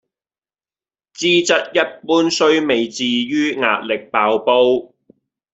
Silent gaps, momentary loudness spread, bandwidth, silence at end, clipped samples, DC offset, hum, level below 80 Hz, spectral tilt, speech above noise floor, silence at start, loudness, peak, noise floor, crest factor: none; 5 LU; 8 kHz; 0.7 s; under 0.1%; under 0.1%; none; -64 dBFS; -3 dB/octave; over 74 dB; 1.2 s; -16 LUFS; -2 dBFS; under -90 dBFS; 16 dB